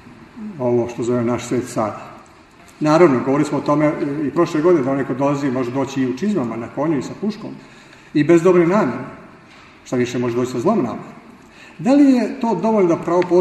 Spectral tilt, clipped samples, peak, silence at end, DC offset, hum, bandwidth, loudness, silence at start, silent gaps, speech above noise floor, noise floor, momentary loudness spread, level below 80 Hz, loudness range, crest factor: -7 dB/octave; under 0.1%; 0 dBFS; 0 s; under 0.1%; none; 12 kHz; -18 LUFS; 0.05 s; none; 28 dB; -45 dBFS; 12 LU; -56 dBFS; 4 LU; 18 dB